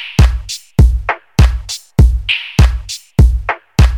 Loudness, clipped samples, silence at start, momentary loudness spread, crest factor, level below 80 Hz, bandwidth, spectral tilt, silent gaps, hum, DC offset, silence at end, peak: -14 LUFS; under 0.1%; 0 s; 7 LU; 12 dB; -14 dBFS; 13.5 kHz; -5.5 dB/octave; none; none; 0.2%; 0 s; 0 dBFS